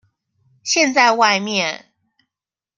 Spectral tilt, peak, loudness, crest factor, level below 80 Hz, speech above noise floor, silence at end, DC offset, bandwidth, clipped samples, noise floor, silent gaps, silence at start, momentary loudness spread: -2 dB/octave; 0 dBFS; -16 LUFS; 18 dB; -72 dBFS; 72 dB; 1 s; under 0.1%; 11 kHz; under 0.1%; -88 dBFS; none; 0.65 s; 15 LU